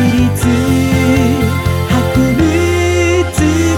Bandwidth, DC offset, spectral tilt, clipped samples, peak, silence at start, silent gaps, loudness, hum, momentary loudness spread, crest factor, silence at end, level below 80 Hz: 17.5 kHz; under 0.1%; -6 dB/octave; under 0.1%; -2 dBFS; 0 s; none; -12 LUFS; none; 2 LU; 10 dB; 0 s; -28 dBFS